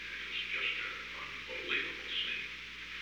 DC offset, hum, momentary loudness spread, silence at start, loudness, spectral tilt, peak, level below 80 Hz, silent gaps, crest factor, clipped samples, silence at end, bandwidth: under 0.1%; none; 8 LU; 0 s; -37 LUFS; -1.5 dB/octave; -20 dBFS; -62 dBFS; none; 20 dB; under 0.1%; 0 s; over 20 kHz